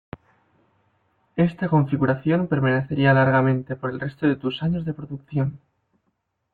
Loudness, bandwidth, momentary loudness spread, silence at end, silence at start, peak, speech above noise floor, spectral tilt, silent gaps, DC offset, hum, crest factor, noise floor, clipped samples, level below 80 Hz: -22 LUFS; 4.5 kHz; 11 LU; 0.95 s; 1.35 s; -6 dBFS; 52 dB; -10.5 dB/octave; none; under 0.1%; none; 18 dB; -74 dBFS; under 0.1%; -56 dBFS